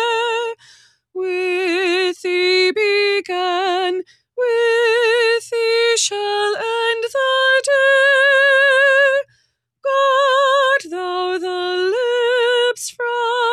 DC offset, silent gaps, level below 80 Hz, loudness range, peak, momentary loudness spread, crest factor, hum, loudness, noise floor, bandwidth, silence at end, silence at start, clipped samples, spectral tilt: under 0.1%; none; -72 dBFS; 4 LU; -4 dBFS; 11 LU; 12 dB; none; -16 LUFS; -64 dBFS; 13.5 kHz; 0 s; 0 s; under 0.1%; 0 dB/octave